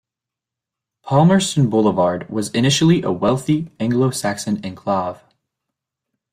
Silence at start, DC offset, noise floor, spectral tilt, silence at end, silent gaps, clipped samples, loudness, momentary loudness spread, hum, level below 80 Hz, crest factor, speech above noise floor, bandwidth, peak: 1.05 s; under 0.1%; -86 dBFS; -5.5 dB/octave; 1.2 s; none; under 0.1%; -18 LUFS; 9 LU; none; -52 dBFS; 16 dB; 69 dB; 15.5 kHz; -2 dBFS